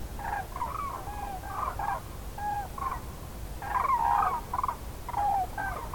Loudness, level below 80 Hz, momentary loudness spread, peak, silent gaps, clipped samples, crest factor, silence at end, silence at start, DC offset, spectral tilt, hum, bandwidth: -32 LUFS; -42 dBFS; 13 LU; -14 dBFS; none; under 0.1%; 18 dB; 0 s; 0 s; 0.2%; -4.5 dB/octave; none; 18 kHz